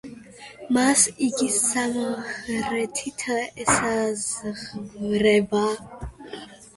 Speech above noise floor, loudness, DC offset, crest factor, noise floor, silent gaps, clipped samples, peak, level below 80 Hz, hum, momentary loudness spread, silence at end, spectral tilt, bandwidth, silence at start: 20 dB; -23 LUFS; under 0.1%; 20 dB; -43 dBFS; none; under 0.1%; -6 dBFS; -52 dBFS; none; 20 LU; 0.1 s; -3 dB/octave; 12 kHz; 0.05 s